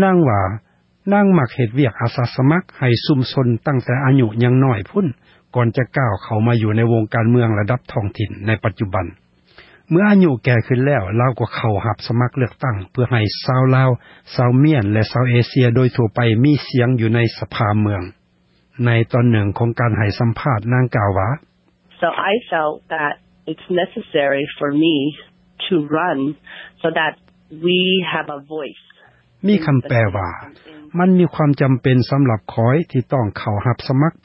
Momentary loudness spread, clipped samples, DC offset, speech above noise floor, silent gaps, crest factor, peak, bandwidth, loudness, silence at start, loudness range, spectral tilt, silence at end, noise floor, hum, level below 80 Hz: 9 LU; under 0.1%; under 0.1%; 42 dB; none; 16 dB; -2 dBFS; 5.8 kHz; -17 LUFS; 0 s; 4 LU; -11 dB/octave; 0.15 s; -58 dBFS; none; -44 dBFS